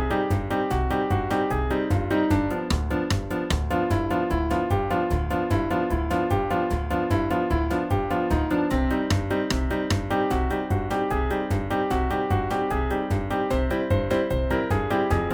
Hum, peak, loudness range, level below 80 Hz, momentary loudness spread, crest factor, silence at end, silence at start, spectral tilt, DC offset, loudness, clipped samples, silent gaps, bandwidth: none; -8 dBFS; 1 LU; -32 dBFS; 2 LU; 16 dB; 0 s; 0 s; -6.5 dB/octave; under 0.1%; -25 LUFS; under 0.1%; none; over 20 kHz